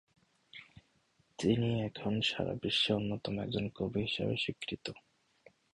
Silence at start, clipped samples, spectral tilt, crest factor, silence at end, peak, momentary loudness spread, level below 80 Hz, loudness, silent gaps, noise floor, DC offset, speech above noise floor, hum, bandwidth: 0.55 s; under 0.1%; -5.5 dB/octave; 20 dB; 0.75 s; -16 dBFS; 21 LU; -62 dBFS; -34 LUFS; none; -73 dBFS; under 0.1%; 38 dB; none; 10.5 kHz